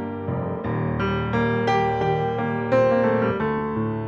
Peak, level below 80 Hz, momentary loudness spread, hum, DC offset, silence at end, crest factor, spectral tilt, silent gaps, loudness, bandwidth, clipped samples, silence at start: -8 dBFS; -44 dBFS; 8 LU; none; under 0.1%; 0 s; 16 dB; -8 dB/octave; none; -23 LUFS; 7.6 kHz; under 0.1%; 0 s